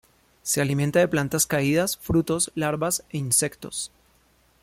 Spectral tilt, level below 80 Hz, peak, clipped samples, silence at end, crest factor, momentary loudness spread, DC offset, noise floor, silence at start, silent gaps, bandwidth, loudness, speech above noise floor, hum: -4 dB/octave; -52 dBFS; -8 dBFS; under 0.1%; 0.75 s; 18 dB; 11 LU; under 0.1%; -61 dBFS; 0.45 s; none; 16.5 kHz; -23 LUFS; 38 dB; none